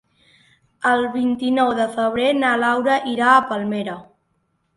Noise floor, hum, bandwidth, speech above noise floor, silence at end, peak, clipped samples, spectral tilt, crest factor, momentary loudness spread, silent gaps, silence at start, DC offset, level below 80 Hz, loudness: -68 dBFS; none; 11.5 kHz; 50 dB; 0.75 s; -2 dBFS; under 0.1%; -5 dB/octave; 18 dB; 9 LU; none; 0.8 s; under 0.1%; -62 dBFS; -19 LUFS